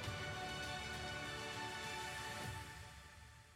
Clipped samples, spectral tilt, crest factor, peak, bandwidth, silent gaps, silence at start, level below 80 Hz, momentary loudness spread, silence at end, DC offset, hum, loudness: under 0.1%; -3 dB/octave; 14 dB; -34 dBFS; 16 kHz; none; 0 s; -62 dBFS; 11 LU; 0 s; under 0.1%; none; -46 LUFS